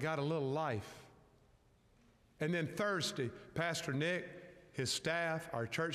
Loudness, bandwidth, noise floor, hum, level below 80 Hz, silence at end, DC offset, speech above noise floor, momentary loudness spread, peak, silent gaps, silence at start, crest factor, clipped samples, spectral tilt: -38 LUFS; 15 kHz; -69 dBFS; none; -72 dBFS; 0 s; under 0.1%; 31 dB; 11 LU; -24 dBFS; none; 0 s; 16 dB; under 0.1%; -4.5 dB/octave